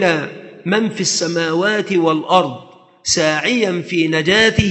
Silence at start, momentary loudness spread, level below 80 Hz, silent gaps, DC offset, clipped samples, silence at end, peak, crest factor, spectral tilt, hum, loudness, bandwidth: 0 s; 12 LU; -42 dBFS; none; under 0.1%; under 0.1%; 0 s; 0 dBFS; 16 dB; -3.5 dB/octave; none; -16 LUFS; 8.8 kHz